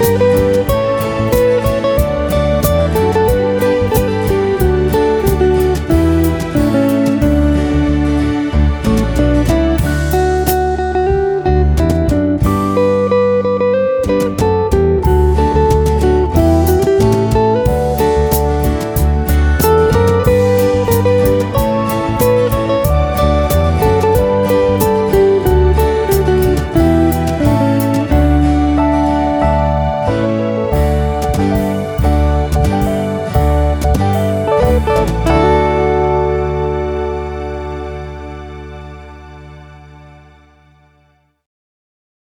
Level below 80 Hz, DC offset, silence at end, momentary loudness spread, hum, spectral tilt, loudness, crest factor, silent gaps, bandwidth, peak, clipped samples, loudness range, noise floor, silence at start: -20 dBFS; under 0.1%; 2.25 s; 4 LU; none; -7 dB/octave; -13 LUFS; 12 dB; none; over 20 kHz; 0 dBFS; under 0.1%; 3 LU; -55 dBFS; 0 s